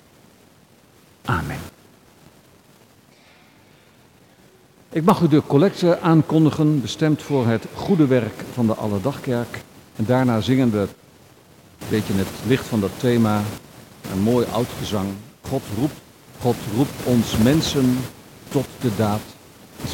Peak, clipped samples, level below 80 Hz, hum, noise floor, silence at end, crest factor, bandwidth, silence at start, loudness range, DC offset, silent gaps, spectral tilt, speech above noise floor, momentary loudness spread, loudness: -4 dBFS; under 0.1%; -48 dBFS; none; -52 dBFS; 0 s; 18 dB; 17 kHz; 1.25 s; 10 LU; under 0.1%; none; -6.5 dB/octave; 33 dB; 13 LU; -21 LUFS